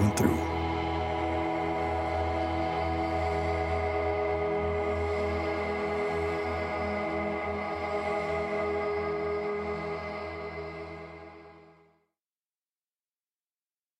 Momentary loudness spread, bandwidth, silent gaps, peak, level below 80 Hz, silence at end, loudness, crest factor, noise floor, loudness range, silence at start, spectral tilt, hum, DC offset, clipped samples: 8 LU; 16 kHz; none; -10 dBFS; -44 dBFS; 2.3 s; -31 LUFS; 20 dB; under -90 dBFS; 11 LU; 0 s; -6 dB/octave; none; under 0.1%; under 0.1%